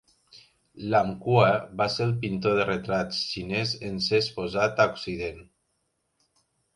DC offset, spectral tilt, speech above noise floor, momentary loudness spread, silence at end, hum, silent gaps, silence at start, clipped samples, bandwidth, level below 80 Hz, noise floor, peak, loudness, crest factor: under 0.1%; -5.5 dB/octave; 50 dB; 8 LU; 1.35 s; none; none; 0.35 s; under 0.1%; 11.5 kHz; -56 dBFS; -75 dBFS; -4 dBFS; -26 LUFS; 22 dB